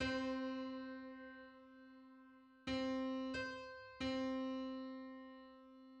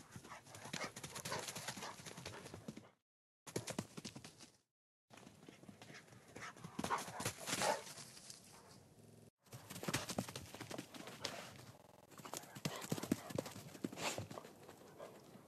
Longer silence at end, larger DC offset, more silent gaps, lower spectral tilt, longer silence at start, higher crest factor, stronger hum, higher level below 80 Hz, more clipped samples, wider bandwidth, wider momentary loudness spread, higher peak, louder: about the same, 0 s vs 0 s; neither; second, none vs 3.02-3.46 s, 4.71-5.08 s, 9.30-9.37 s; first, -5 dB/octave vs -3.5 dB/octave; about the same, 0 s vs 0 s; second, 18 dB vs 30 dB; neither; first, -68 dBFS vs -78 dBFS; neither; second, 8.4 kHz vs 14 kHz; about the same, 20 LU vs 18 LU; second, -28 dBFS vs -20 dBFS; about the same, -45 LUFS vs -47 LUFS